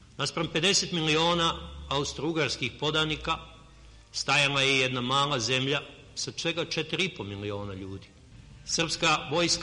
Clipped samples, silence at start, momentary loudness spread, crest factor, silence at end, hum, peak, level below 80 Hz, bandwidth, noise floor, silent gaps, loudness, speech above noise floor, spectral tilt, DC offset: under 0.1%; 0 s; 13 LU; 18 dB; 0 s; none; -10 dBFS; -52 dBFS; 11 kHz; -52 dBFS; none; -27 LUFS; 24 dB; -3 dB/octave; under 0.1%